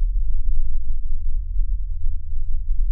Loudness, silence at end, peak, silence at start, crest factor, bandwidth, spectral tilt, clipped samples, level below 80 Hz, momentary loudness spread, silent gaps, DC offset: -30 LUFS; 0 s; -6 dBFS; 0 s; 10 dB; 0.2 kHz; -23 dB/octave; under 0.1%; -18 dBFS; 4 LU; none; under 0.1%